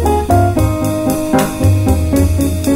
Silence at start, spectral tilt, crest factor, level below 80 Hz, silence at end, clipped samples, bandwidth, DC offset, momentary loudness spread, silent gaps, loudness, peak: 0 s; -6.5 dB/octave; 12 dB; -22 dBFS; 0 s; under 0.1%; 16.5 kHz; under 0.1%; 3 LU; none; -14 LUFS; 0 dBFS